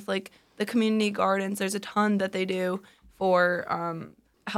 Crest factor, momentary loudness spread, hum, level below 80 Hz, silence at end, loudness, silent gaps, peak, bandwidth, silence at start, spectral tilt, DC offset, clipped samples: 18 dB; 11 LU; none; -68 dBFS; 0 s; -27 LUFS; none; -10 dBFS; 15.5 kHz; 0 s; -5 dB/octave; under 0.1%; under 0.1%